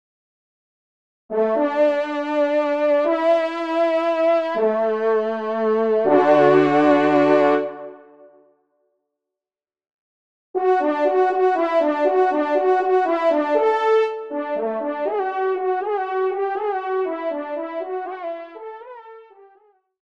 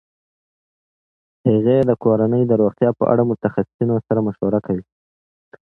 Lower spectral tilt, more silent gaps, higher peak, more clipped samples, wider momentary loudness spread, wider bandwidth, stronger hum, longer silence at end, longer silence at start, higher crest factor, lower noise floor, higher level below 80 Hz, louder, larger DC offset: second, -6.5 dB/octave vs -11.5 dB/octave; first, 9.93-10.54 s vs 3.74-3.79 s; about the same, -2 dBFS vs -2 dBFS; neither; first, 12 LU vs 6 LU; first, 7.8 kHz vs 4 kHz; neither; about the same, 0.8 s vs 0.85 s; second, 1.3 s vs 1.45 s; about the same, 18 dB vs 18 dB; about the same, under -90 dBFS vs under -90 dBFS; second, -74 dBFS vs -54 dBFS; about the same, -20 LUFS vs -18 LUFS; first, 0.1% vs under 0.1%